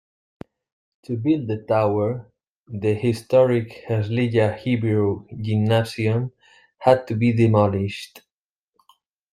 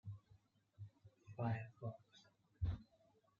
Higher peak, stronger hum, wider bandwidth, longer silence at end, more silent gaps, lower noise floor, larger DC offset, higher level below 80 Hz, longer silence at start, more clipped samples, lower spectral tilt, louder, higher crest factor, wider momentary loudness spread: first, -2 dBFS vs -30 dBFS; neither; first, 12.5 kHz vs 7 kHz; first, 1.15 s vs 0.55 s; first, 2.49-2.66 s vs none; first, -87 dBFS vs -76 dBFS; neither; about the same, -58 dBFS vs -60 dBFS; first, 1.1 s vs 0.05 s; neither; about the same, -8 dB/octave vs -7.5 dB/octave; first, -21 LUFS vs -48 LUFS; about the same, 20 dB vs 20 dB; second, 11 LU vs 22 LU